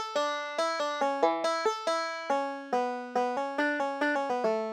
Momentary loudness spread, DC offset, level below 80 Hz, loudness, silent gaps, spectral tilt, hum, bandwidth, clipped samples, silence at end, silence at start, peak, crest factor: 4 LU; under 0.1%; -88 dBFS; -30 LUFS; none; -2.5 dB/octave; none; 13.5 kHz; under 0.1%; 0 s; 0 s; -10 dBFS; 20 dB